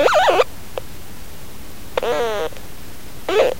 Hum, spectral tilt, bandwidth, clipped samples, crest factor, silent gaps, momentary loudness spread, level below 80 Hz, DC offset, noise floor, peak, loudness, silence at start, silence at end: none; -3.5 dB/octave; 16 kHz; under 0.1%; 20 dB; none; 22 LU; -42 dBFS; 4%; -37 dBFS; 0 dBFS; -20 LUFS; 0 s; 0 s